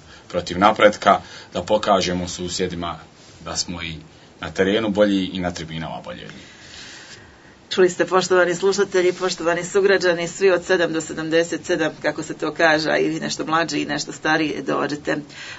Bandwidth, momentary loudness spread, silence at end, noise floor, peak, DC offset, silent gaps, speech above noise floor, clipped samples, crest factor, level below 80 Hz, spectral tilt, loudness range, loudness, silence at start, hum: 8 kHz; 16 LU; 0 s; -46 dBFS; 0 dBFS; under 0.1%; none; 26 dB; under 0.1%; 20 dB; -56 dBFS; -4 dB/octave; 5 LU; -20 LUFS; 0.1 s; none